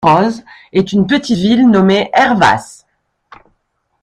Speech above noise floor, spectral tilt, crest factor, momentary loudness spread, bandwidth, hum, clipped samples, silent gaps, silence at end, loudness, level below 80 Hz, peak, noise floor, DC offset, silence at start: 54 dB; -6 dB/octave; 12 dB; 9 LU; 11 kHz; none; under 0.1%; none; 1.4 s; -12 LUFS; -46 dBFS; 0 dBFS; -65 dBFS; under 0.1%; 0 s